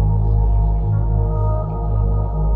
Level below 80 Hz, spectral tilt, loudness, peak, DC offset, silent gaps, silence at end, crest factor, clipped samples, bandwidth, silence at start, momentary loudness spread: -18 dBFS; -13.5 dB/octave; -19 LUFS; -8 dBFS; under 0.1%; none; 0 s; 10 dB; under 0.1%; 1.6 kHz; 0 s; 3 LU